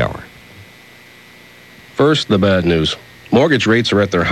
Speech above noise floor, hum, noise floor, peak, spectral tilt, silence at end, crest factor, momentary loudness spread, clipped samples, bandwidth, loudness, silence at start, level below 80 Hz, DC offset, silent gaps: 29 dB; 60 Hz at -45 dBFS; -42 dBFS; -2 dBFS; -5.5 dB/octave; 0 s; 14 dB; 12 LU; under 0.1%; 12.5 kHz; -14 LUFS; 0 s; -42 dBFS; under 0.1%; none